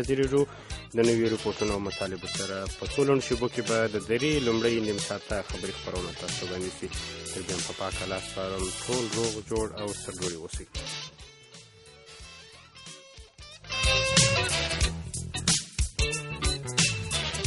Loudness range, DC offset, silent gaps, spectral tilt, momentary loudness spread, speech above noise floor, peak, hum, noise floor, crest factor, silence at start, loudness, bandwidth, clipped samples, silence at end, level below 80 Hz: 10 LU; under 0.1%; none; -3.5 dB/octave; 20 LU; 22 dB; -6 dBFS; none; -52 dBFS; 24 dB; 0 s; -28 LUFS; 11.5 kHz; under 0.1%; 0 s; -42 dBFS